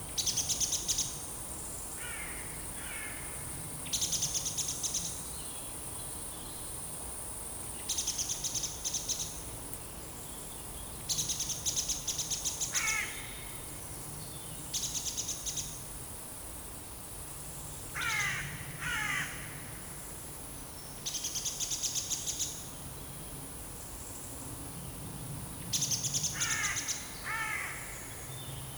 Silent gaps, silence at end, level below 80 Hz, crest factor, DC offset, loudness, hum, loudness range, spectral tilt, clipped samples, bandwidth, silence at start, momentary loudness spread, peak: none; 0 s; -54 dBFS; 20 dB; under 0.1%; -35 LUFS; none; 4 LU; -1 dB/octave; under 0.1%; over 20 kHz; 0 s; 12 LU; -18 dBFS